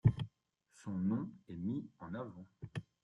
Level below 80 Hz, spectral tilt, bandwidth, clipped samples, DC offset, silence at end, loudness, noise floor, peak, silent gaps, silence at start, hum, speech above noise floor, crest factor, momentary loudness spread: -60 dBFS; -9 dB/octave; 10 kHz; under 0.1%; under 0.1%; 0.2 s; -42 LUFS; -74 dBFS; -16 dBFS; none; 0.05 s; none; 33 dB; 24 dB; 12 LU